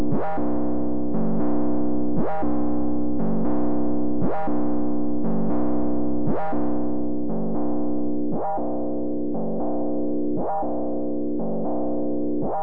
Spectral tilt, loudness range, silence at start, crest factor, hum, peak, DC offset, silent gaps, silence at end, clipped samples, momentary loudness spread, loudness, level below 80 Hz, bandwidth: -12.5 dB/octave; 2 LU; 0 s; 10 dB; none; -12 dBFS; 10%; none; 0 s; under 0.1%; 3 LU; -26 LUFS; -42 dBFS; 3 kHz